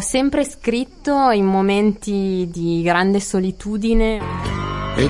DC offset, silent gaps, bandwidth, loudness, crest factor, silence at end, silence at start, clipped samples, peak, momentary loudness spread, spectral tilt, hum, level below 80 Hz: under 0.1%; none; 11.5 kHz; -19 LUFS; 16 dB; 0 s; 0 s; under 0.1%; -2 dBFS; 8 LU; -5.5 dB/octave; none; -30 dBFS